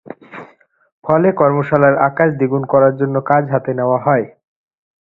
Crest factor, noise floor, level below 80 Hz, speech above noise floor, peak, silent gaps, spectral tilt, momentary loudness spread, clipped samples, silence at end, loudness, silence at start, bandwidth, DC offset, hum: 16 dB; -47 dBFS; -54 dBFS; 34 dB; 0 dBFS; 0.92-1.02 s; -11.5 dB/octave; 18 LU; under 0.1%; 0.75 s; -14 LUFS; 0.05 s; 4.1 kHz; under 0.1%; none